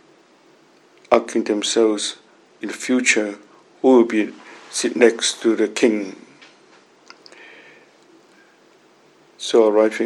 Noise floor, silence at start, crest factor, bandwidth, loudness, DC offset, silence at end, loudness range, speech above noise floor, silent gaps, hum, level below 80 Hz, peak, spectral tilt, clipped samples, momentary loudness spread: -53 dBFS; 1.1 s; 20 dB; 12 kHz; -18 LUFS; under 0.1%; 0 s; 8 LU; 36 dB; none; none; -70 dBFS; 0 dBFS; -2.5 dB/octave; under 0.1%; 16 LU